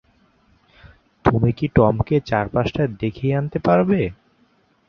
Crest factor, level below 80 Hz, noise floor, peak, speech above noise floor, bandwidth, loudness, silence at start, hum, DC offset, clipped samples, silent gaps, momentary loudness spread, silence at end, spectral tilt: 18 dB; -40 dBFS; -60 dBFS; -2 dBFS; 41 dB; 6.6 kHz; -20 LUFS; 1.25 s; none; under 0.1%; under 0.1%; none; 6 LU; 0.75 s; -9 dB/octave